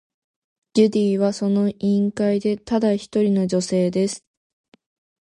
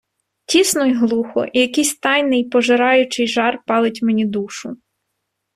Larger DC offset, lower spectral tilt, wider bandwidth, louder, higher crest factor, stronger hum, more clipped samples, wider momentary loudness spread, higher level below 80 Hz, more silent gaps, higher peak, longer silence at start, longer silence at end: neither; first, -6.5 dB/octave vs -3 dB/octave; second, 11 kHz vs 15 kHz; second, -20 LUFS vs -16 LUFS; about the same, 16 dB vs 16 dB; neither; neither; about the same, 5 LU vs 7 LU; about the same, -60 dBFS vs -62 dBFS; neither; about the same, -4 dBFS vs -2 dBFS; first, 0.75 s vs 0.5 s; first, 1.1 s vs 0.8 s